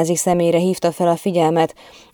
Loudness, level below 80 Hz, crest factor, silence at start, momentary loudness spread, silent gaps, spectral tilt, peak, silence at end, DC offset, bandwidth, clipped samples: -17 LUFS; -54 dBFS; 14 dB; 0 s; 3 LU; none; -5.5 dB/octave; -4 dBFS; 0.45 s; under 0.1%; over 20 kHz; under 0.1%